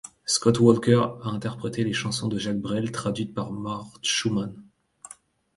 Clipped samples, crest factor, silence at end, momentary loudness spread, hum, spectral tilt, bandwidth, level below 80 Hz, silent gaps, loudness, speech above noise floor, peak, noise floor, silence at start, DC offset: under 0.1%; 22 dB; 0.95 s; 14 LU; none; -5 dB/octave; 11.5 kHz; -58 dBFS; none; -25 LUFS; 27 dB; -2 dBFS; -51 dBFS; 0.05 s; under 0.1%